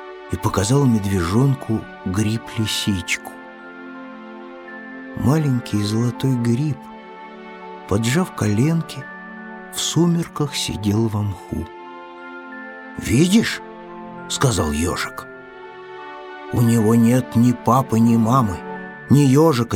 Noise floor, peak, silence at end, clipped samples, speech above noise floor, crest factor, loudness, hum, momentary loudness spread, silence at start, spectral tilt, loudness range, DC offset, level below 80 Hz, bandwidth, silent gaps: -38 dBFS; -2 dBFS; 0 s; under 0.1%; 20 dB; 18 dB; -19 LUFS; none; 21 LU; 0 s; -6 dB/octave; 6 LU; under 0.1%; -44 dBFS; 17.5 kHz; none